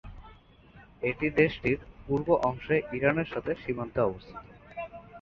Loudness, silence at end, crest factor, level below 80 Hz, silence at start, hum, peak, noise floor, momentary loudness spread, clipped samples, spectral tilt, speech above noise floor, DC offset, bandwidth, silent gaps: -29 LUFS; 0 s; 20 dB; -52 dBFS; 0.05 s; none; -10 dBFS; -55 dBFS; 18 LU; under 0.1%; -8 dB/octave; 26 dB; under 0.1%; 7.2 kHz; none